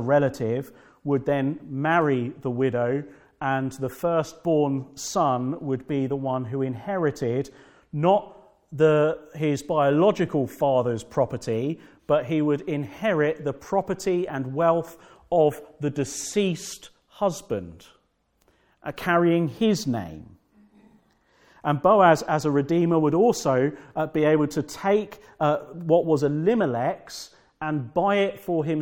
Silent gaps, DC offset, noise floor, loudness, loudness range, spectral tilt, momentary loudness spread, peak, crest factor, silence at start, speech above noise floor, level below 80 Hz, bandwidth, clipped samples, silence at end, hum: none; under 0.1%; -68 dBFS; -24 LUFS; 5 LU; -6.5 dB/octave; 11 LU; -2 dBFS; 22 dB; 0 s; 45 dB; -60 dBFS; 17.5 kHz; under 0.1%; 0 s; none